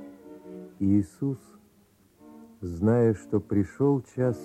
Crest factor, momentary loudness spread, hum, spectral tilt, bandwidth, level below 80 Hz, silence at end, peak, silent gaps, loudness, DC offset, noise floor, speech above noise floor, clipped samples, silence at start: 16 dB; 21 LU; none; -10 dB/octave; 13 kHz; -58 dBFS; 0 s; -12 dBFS; none; -26 LUFS; under 0.1%; -61 dBFS; 36 dB; under 0.1%; 0 s